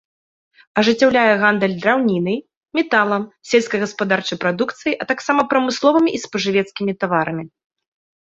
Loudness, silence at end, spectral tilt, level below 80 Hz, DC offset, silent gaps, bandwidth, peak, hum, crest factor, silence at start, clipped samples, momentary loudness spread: -18 LUFS; 0.8 s; -5 dB/octave; -60 dBFS; under 0.1%; 2.57-2.61 s; 8 kHz; -2 dBFS; none; 18 dB; 0.75 s; under 0.1%; 9 LU